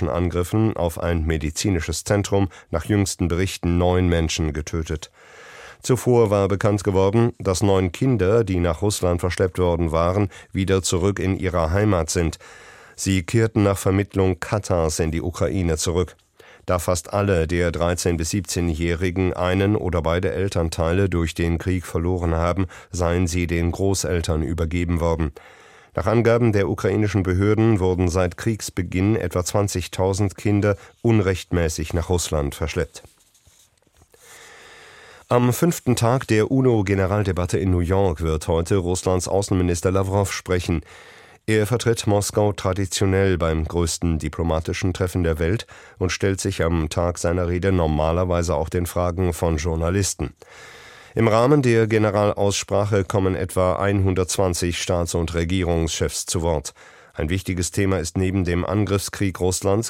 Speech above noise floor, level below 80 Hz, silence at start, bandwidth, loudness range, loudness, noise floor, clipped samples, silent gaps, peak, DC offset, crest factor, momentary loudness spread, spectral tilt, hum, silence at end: 37 dB; -36 dBFS; 0 s; 16.5 kHz; 3 LU; -21 LUFS; -58 dBFS; under 0.1%; none; -4 dBFS; under 0.1%; 18 dB; 6 LU; -5.5 dB/octave; none; 0 s